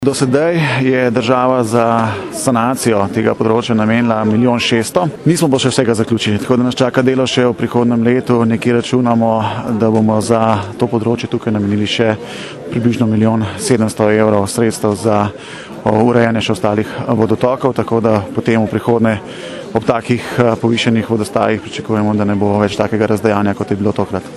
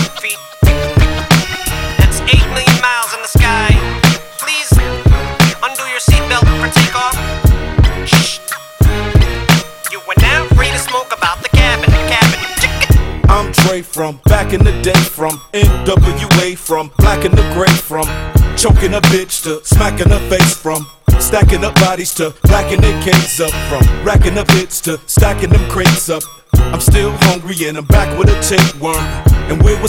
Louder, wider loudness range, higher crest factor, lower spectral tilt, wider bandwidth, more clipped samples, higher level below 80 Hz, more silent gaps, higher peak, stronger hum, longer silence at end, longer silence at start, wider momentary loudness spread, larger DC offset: about the same, -14 LUFS vs -12 LUFS; about the same, 2 LU vs 1 LU; about the same, 14 dB vs 10 dB; first, -6 dB/octave vs -4.5 dB/octave; second, 13 kHz vs 17 kHz; second, under 0.1% vs 0.2%; second, -48 dBFS vs -16 dBFS; neither; about the same, 0 dBFS vs 0 dBFS; neither; about the same, 0 s vs 0 s; about the same, 0 s vs 0 s; about the same, 5 LU vs 7 LU; neither